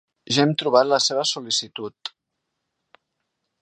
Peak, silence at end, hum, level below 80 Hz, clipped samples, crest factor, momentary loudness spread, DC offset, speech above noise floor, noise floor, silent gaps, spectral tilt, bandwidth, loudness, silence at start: -2 dBFS; 1.55 s; none; -70 dBFS; under 0.1%; 22 dB; 15 LU; under 0.1%; 59 dB; -79 dBFS; none; -3.5 dB/octave; 10 kHz; -20 LUFS; 0.3 s